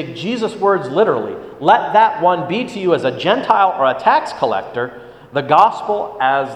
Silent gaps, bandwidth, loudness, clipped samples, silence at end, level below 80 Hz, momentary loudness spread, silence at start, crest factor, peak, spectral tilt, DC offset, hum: none; 10 kHz; -16 LUFS; under 0.1%; 0 s; -58 dBFS; 10 LU; 0 s; 16 dB; 0 dBFS; -5.5 dB/octave; under 0.1%; none